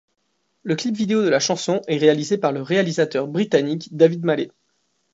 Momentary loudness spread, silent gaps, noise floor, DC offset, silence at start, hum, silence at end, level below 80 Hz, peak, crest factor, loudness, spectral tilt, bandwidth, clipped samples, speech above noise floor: 7 LU; none; -69 dBFS; under 0.1%; 0.65 s; none; 0.65 s; -70 dBFS; -2 dBFS; 18 dB; -20 LUFS; -5 dB/octave; 8 kHz; under 0.1%; 50 dB